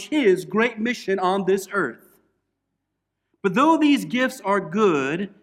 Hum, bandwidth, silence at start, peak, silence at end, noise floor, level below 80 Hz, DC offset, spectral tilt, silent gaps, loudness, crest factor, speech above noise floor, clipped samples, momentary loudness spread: none; 15.5 kHz; 0 s; -6 dBFS; 0.15 s; -79 dBFS; -68 dBFS; under 0.1%; -5.5 dB/octave; none; -21 LUFS; 16 dB; 58 dB; under 0.1%; 8 LU